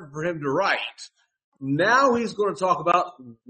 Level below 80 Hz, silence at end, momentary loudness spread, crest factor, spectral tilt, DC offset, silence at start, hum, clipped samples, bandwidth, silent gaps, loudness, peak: -66 dBFS; 0.15 s; 15 LU; 18 dB; -5 dB/octave; under 0.1%; 0 s; none; under 0.1%; 8.8 kHz; 1.44-1.52 s; -22 LUFS; -6 dBFS